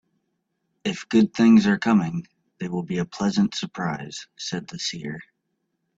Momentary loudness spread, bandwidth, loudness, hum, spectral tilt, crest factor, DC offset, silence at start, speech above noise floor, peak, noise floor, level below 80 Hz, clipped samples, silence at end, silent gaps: 17 LU; 7.8 kHz; -23 LUFS; none; -5.5 dB/octave; 18 dB; under 0.1%; 0.85 s; 54 dB; -6 dBFS; -76 dBFS; -62 dBFS; under 0.1%; 0.75 s; none